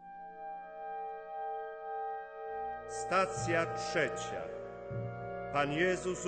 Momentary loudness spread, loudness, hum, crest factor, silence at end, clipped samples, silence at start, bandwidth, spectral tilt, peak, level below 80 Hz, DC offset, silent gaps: 13 LU; -36 LUFS; none; 20 dB; 0 s; under 0.1%; 0 s; 9.2 kHz; -4.5 dB/octave; -16 dBFS; -62 dBFS; under 0.1%; none